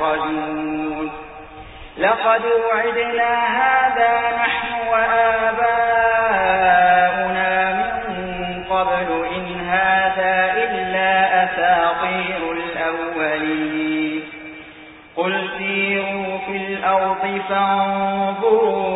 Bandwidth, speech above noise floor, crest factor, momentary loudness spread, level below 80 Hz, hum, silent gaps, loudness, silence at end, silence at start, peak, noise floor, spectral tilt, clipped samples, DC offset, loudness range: 4 kHz; 23 dB; 16 dB; 10 LU; -48 dBFS; none; none; -18 LUFS; 0 s; 0 s; -2 dBFS; -41 dBFS; -9.5 dB/octave; under 0.1%; under 0.1%; 6 LU